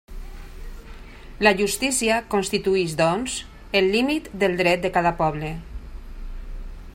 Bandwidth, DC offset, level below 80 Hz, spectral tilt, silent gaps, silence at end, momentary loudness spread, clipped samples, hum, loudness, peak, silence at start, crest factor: 16 kHz; under 0.1%; -38 dBFS; -4 dB/octave; none; 0 s; 23 LU; under 0.1%; none; -22 LUFS; -4 dBFS; 0.1 s; 20 dB